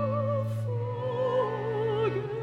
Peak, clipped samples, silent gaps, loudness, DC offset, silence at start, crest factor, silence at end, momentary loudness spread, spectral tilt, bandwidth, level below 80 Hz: -16 dBFS; under 0.1%; none; -30 LUFS; under 0.1%; 0 s; 12 dB; 0 s; 4 LU; -8.5 dB/octave; 7 kHz; -60 dBFS